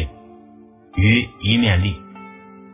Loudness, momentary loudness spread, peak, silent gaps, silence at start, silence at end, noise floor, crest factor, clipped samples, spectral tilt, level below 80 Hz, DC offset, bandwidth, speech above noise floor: -18 LUFS; 23 LU; -2 dBFS; none; 0 s; 0.4 s; -46 dBFS; 18 dB; under 0.1%; -10 dB/octave; -32 dBFS; under 0.1%; 3.8 kHz; 29 dB